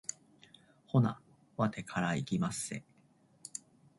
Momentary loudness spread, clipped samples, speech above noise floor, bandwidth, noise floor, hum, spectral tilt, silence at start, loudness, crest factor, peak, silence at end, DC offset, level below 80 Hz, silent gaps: 17 LU; under 0.1%; 34 dB; 11.5 kHz; -67 dBFS; none; -5.5 dB/octave; 0.1 s; -35 LUFS; 20 dB; -16 dBFS; 0.4 s; under 0.1%; -68 dBFS; none